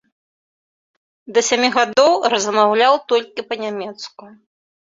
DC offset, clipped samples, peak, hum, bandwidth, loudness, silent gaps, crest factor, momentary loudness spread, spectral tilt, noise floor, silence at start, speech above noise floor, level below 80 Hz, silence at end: under 0.1%; under 0.1%; -2 dBFS; none; 7.8 kHz; -16 LUFS; none; 18 dB; 14 LU; -2 dB/octave; under -90 dBFS; 1.3 s; over 73 dB; -66 dBFS; 0.55 s